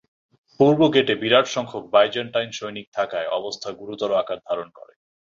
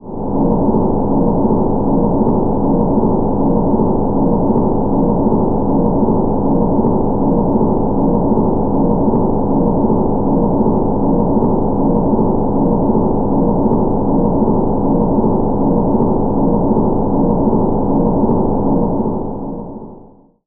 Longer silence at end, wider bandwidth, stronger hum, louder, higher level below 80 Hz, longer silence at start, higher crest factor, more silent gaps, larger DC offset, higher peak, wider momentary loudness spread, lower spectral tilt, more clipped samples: first, 0.65 s vs 0.45 s; first, 7.6 kHz vs 1.7 kHz; neither; second, -21 LUFS vs -15 LUFS; second, -64 dBFS vs -24 dBFS; first, 0.6 s vs 0 s; first, 20 dB vs 10 dB; first, 2.87-2.92 s vs none; neither; about the same, -2 dBFS vs -2 dBFS; first, 13 LU vs 1 LU; second, -5 dB/octave vs -17 dB/octave; neither